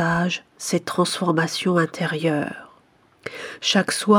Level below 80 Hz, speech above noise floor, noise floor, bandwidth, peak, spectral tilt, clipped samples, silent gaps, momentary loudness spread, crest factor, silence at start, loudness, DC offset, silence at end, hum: -60 dBFS; 35 dB; -57 dBFS; 17 kHz; -4 dBFS; -4.5 dB/octave; under 0.1%; none; 14 LU; 18 dB; 0 s; -22 LUFS; under 0.1%; 0 s; none